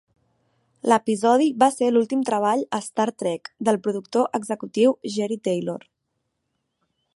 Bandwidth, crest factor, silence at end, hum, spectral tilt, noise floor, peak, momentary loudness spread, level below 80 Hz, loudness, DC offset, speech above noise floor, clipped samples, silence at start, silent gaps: 11.5 kHz; 20 dB; 1.35 s; none; -5 dB/octave; -77 dBFS; -2 dBFS; 9 LU; -76 dBFS; -22 LUFS; under 0.1%; 55 dB; under 0.1%; 0.85 s; none